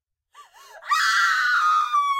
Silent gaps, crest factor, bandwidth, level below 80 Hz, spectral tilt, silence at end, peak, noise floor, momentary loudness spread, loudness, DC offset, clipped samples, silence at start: none; 14 dB; 16 kHz; -80 dBFS; 5 dB/octave; 0 s; -10 dBFS; -52 dBFS; 6 LU; -19 LUFS; under 0.1%; under 0.1%; 0.4 s